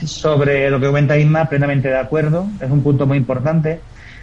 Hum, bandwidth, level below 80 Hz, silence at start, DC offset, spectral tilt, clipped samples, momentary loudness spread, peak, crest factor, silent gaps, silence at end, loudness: none; 7.6 kHz; -40 dBFS; 0 s; under 0.1%; -7.5 dB/octave; under 0.1%; 5 LU; -4 dBFS; 12 dB; none; 0 s; -16 LUFS